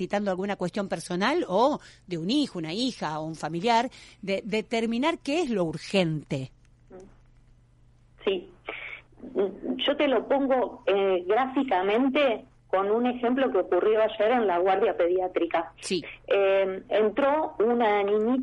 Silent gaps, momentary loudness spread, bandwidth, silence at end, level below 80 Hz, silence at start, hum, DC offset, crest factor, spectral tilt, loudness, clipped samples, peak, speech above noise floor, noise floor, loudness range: none; 10 LU; 11.5 kHz; 0 s; -60 dBFS; 0 s; none; under 0.1%; 16 dB; -5.5 dB/octave; -26 LUFS; under 0.1%; -10 dBFS; 32 dB; -58 dBFS; 7 LU